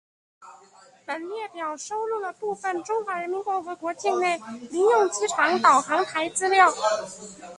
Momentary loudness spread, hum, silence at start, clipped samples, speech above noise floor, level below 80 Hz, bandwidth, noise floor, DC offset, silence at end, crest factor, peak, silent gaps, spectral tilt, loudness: 14 LU; none; 0.4 s; under 0.1%; 29 dB; -72 dBFS; 11.5 kHz; -54 dBFS; under 0.1%; 0 s; 22 dB; -4 dBFS; none; -2 dB/octave; -24 LUFS